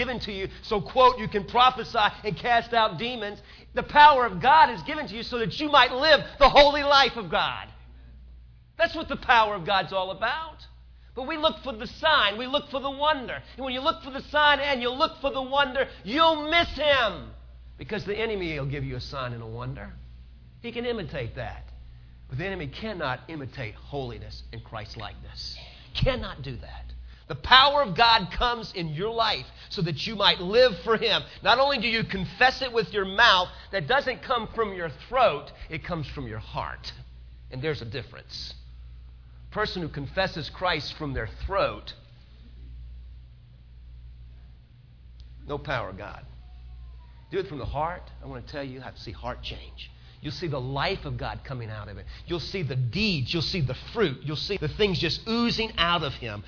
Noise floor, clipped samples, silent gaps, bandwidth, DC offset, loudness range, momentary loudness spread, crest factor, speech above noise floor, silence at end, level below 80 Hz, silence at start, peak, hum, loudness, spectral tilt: -51 dBFS; under 0.1%; none; 5.4 kHz; under 0.1%; 14 LU; 19 LU; 24 dB; 25 dB; 0 s; -44 dBFS; 0 s; -2 dBFS; none; -24 LUFS; -5 dB/octave